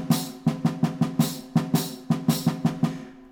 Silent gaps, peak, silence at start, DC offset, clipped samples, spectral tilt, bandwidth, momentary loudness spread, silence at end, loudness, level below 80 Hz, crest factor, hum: none; -8 dBFS; 0 s; under 0.1%; under 0.1%; -6 dB/octave; over 20 kHz; 4 LU; 0 s; -26 LUFS; -58 dBFS; 16 dB; none